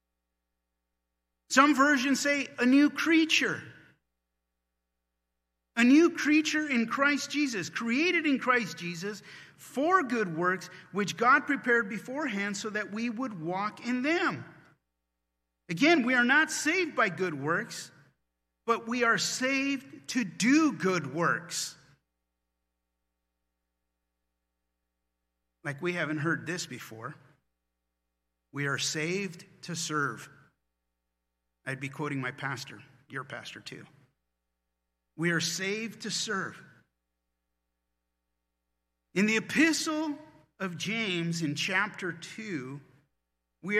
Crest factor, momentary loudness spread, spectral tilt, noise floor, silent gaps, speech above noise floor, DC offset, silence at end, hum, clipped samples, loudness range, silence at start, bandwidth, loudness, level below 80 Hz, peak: 24 dB; 17 LU; -4 dB/octave; -84 dBFS; none; 55 dB; under 0.1%; 0 s; none; under 0.1%; 12 LU; 1.5 s; 15 kHz; -28 LUFS; -80 dBFS; -6 dBFS